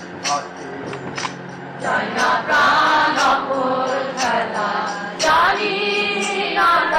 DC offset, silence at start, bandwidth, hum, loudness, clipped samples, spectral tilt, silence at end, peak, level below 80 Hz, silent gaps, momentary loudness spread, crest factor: under 0.1%; 0 s; 16 kHz; none; -18 LUFS; under 0.1%; -2.5 dB/octave; 0 s; -8 dBFS; -54 dBFS; none; 13 LU; 10 dB